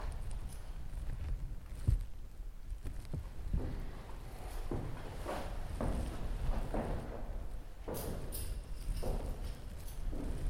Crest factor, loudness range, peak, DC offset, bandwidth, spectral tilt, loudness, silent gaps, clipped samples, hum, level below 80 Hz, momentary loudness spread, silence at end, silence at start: 20 dB; 2 LU; -18 dBFS; under 0.1%; 16.5 kHz; -6 dB/octave; -44 LUFS; none; under 0.1%; none; -40 dBFS; 10 LU; 0 s; 0 s